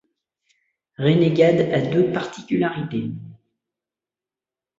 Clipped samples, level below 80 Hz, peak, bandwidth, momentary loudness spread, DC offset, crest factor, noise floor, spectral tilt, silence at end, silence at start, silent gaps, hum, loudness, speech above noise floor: under 0.1%; -60 dBFS; -4 dBFS; 7.8 kHz; 12 LU; under 0.1%; 20 dB; -90 dBFS; -7.5 dB/octave; 1.45 s; 1 s; none; none; -20 LUFS; 71 dB